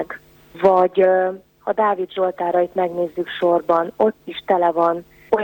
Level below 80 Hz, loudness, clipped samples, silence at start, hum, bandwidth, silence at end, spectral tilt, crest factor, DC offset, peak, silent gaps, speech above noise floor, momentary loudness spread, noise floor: -58 dBFS; -19 LUFS; under 0.1%; 0 s; none; 17 kHz; 0 s; -7.5 dB/octave; 16 dB; under 0.1%; -4 dBFS; none; 20 dB; 10 LU; -38 dBFS